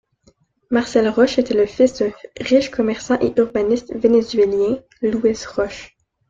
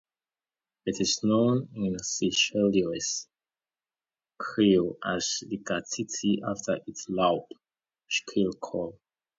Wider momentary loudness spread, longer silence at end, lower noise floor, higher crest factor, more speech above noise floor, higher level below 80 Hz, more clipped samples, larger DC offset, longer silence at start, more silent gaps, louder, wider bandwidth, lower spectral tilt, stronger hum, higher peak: second, 8 LU vs 11 LU; about the same, 0.45 s vs 0.5 s; second, -58 dBFS vs under -90 dBFS; about the same, 16 dB vs 20 dB; second, 40 dB vs over 62 dB; first, -50 dBFS vs -62 dBFS; neither; neither; second, 0.7 s vs 0.85 s; neither; first, -18 LUFS vs -28 LUFS; about the same, 7.8 kHz vs 7.8 kHz; about the same, -5 dB/octave vs -4 dB/octave; neither; first, -2 dBFS vs -10 dBFS